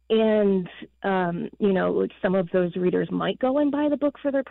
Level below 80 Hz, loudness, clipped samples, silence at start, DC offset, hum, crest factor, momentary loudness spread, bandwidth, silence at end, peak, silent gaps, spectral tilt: -58 dBFS; -24 LUFS; under 0.1%; 0.1 s; under 0.1%; none; 12 dB; 6 LU; 4.2 kHz; 0 s; -12 dBFS; none; -10.5 dB/octave